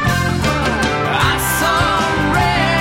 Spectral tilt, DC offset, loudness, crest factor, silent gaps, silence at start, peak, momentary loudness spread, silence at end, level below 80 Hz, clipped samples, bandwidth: -4.5 dB/octave; under 0.1%; -15 LUFS; 12 dB; none; 0 s; -4 dBFS; 2 LU; 0 s; -30 dBFS; under 0.1%; 16.5 kHz